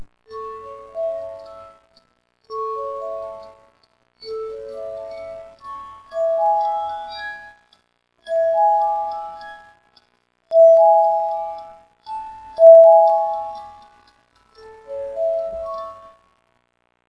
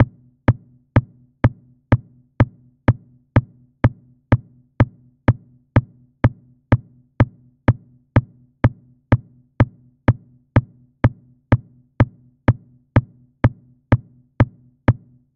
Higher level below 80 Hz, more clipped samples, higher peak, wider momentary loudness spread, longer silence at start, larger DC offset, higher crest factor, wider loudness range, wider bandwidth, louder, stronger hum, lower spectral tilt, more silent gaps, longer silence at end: second, -60 dBFS vs -34 dBFS; neither; about the same, 0 dBFS vs 0 dBFS; first, 25 LU vs 1 LU; about the same, 0 s vs 0 s; neither; about the same, 20 dB vs 20 dB; first, 17 LU vs 1 LU; first, 5.8 kHz vs 4.3 kHz; first, -16 LUFS vs -21 LUFS; first, 60 Hz at -70 dBFS vs none; second, -4 dB/octave vs -10 dB/octave; neither; first, 1.15 s vs 0.45 s